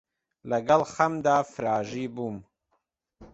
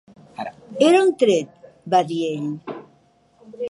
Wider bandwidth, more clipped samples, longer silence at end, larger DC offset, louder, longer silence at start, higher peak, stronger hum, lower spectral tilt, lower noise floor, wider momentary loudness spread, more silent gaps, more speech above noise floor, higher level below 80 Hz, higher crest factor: second, 8.2 kHz vs 11.5 kHz; neither; about the same, 0.05 s vs 0 s; neither; second, -26 LUFS vs -19 LUFS; about the same, 0.45 s vs 0.4 s; about the same, -6 dBFS vs -4 dBFS; neither; about the same, -5.5 dB/octave vs -5 dB/octave; first, -76 dBFS vs -58 dBFS; second, 13 LU vs 21 LU; neither; first, 50 dB vs 40 dB; first, -64 dBFS vs -72 dBFS; about the same, 22 dB vs 18 dB